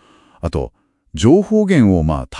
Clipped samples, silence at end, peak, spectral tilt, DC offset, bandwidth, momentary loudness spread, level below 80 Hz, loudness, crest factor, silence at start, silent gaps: under 0.1%; 0 s; 0 dBFS; -7.5 dB/octave; under 0.1%; 11 kHz; 16 LU; -34 dBFS; -15 LUFS; 14 dB; 0.45 s; none